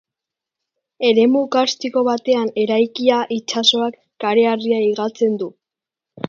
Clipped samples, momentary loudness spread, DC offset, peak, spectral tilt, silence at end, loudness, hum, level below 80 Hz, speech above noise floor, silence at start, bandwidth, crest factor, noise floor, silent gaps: under 0.1%; 7 LU; under 0.1%; 0 dBFS; -4 dB/octave; 0.8 s; -17 LUFS; none; -70 dBFS; 70 dB; 1 s; 7.8 kHz; 18 dB; -87 dBFS; none